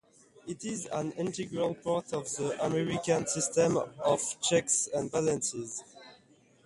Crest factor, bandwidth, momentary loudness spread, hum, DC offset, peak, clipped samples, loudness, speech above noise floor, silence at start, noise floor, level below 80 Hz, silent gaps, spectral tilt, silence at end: 18 dB; 11.5 kHz; 11 LU; none; under 0.1%; -14 dBFS; under 0.1%; -31 LUFS; 31 dB; 0.45 s; -62 dBFS; -66 dBFS; none; -4 dB/octave; 0.5 s